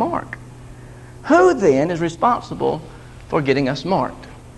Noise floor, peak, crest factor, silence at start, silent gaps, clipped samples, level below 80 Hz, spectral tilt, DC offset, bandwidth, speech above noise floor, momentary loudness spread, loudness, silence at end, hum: -38 dBFS; -2 dBFS; 18 dB; 0 s; none; under 0.1%; -44 dBFS; -6.5 dB/octave; under 0.1%; 11.5 kHz; 21 dB; 25 LU; -18 LUFS; 0.05 s; none